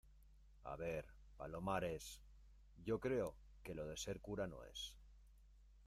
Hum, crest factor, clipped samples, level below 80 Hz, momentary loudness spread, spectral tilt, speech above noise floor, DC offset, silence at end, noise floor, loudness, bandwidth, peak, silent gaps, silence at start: none; 20 dB; under 0.1%; -62 dBFS; 15 LU; -5 dB/octave; 20 dB; under 0.1%; 0 s; -66 dBFS; -47 LUFS; 15.5 kHz; -28 dBFS; none; 0.05 s